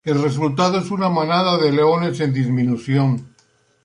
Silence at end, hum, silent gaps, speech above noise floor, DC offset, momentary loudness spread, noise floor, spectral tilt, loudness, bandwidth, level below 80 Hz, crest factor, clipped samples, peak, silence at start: 0.55 s; none; none; 41 dB; under 0.1%; 4 LU; -59 dBFS; -7 dB/octave; -18 LUFS; 11 kHz; -60 dBFS; 14 dB; under 0.1%; -4 dBFS; 0.05 s